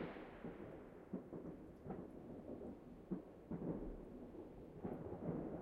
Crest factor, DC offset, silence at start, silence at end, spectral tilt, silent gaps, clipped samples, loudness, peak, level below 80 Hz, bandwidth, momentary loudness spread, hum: 20 dB; under 0.1%; 0 s; 0 s; -9.5 dB/octave; none; under 0.1%; -52 LUFS; -32 dBFS; -64 dBFS; 13 kHz; 9 LU; none